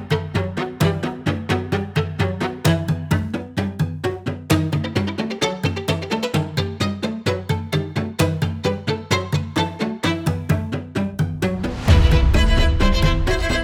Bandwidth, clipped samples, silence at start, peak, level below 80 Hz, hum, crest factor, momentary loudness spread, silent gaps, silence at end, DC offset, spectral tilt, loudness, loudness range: 18.5 kHz; under 0.1%; 0 s; -2 dBFS; -26 dBFS; none; 18 dB; 7 LU; none; 0 s; under 0.1%; -6 dB/octave; -21 LUFS; 4 LU